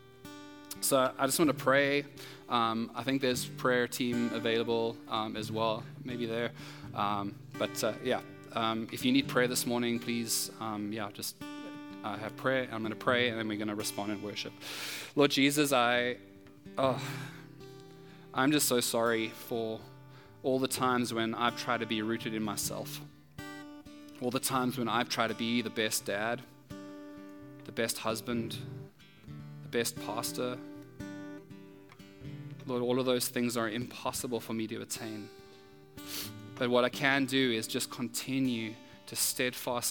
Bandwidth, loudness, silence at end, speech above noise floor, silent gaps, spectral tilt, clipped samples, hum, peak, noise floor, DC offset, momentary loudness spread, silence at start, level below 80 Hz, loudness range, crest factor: 18 kHz; -32 LUFS; 0 s; 23 dB; none; -3.5 dB/octave; under 0.1%; none; -10 dBFS; -55 dBFS; under 0.1%; 19 LU; 0 s; -72 dBFS; 6 LU; 24 dB